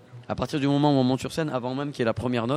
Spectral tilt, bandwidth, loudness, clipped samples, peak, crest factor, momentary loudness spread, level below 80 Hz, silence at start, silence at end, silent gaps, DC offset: -6.5 dB/octave; 13.5 kHz; -26 LUFS; under 0.1%; -8 dBFS; 18 dB; 9 LU; -54 dBFS; 0.1 s; 0 s; none; under 0.1%